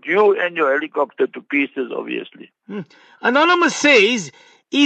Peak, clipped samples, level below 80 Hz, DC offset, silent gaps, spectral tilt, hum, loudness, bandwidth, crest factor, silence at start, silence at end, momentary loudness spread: -2 dBFS; under 0.1%; -72 dBFS; under 0.1%; none; -3 dB/octave; none; -17 LUFS; 8.8 kHz; 16 dB; 0.05 s; 0 s; 20 LU